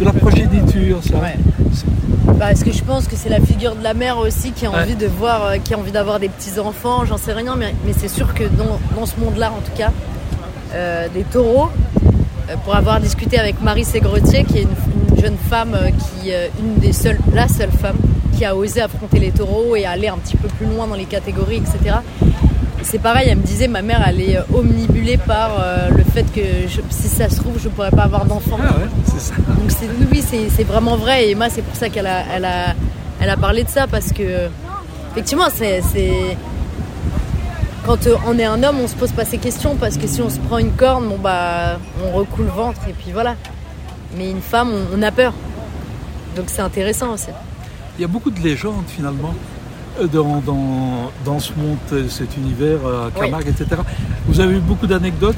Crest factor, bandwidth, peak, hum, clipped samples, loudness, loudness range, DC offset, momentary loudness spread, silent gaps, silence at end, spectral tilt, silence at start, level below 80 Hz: 16 dB; 16.5 kHz; 0 dBFS; none; under 0.1%; -17 LUFS; 5 LU; under 0.1%; 10 LU; none; 0 s; -6 dB/octave; 0 s; -22 dBFS